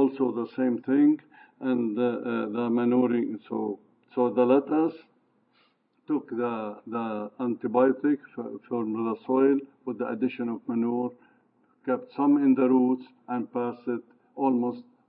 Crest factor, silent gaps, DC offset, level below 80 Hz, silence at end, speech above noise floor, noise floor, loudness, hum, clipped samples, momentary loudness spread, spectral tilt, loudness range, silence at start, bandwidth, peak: 18 dB; none; under 0.1%; -84 dBFS; 0.25 s; 41 dB; -67 dBFS; -27 LUFS; none; under 0.1%; 12 LU; -11 dB/octave; 3 LU; 0 s; 4.4 kHz; -10 dBFS